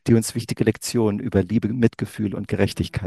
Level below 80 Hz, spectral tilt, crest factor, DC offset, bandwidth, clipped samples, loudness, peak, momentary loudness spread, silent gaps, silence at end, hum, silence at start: -46 dBFS; -6 dB/octave; 20 dB; under 0.1%; 12.5 kHz; under 0.1%; -22 LUFS; -2 dBFS; 6 LU; none; 0 s; none; 0.05 s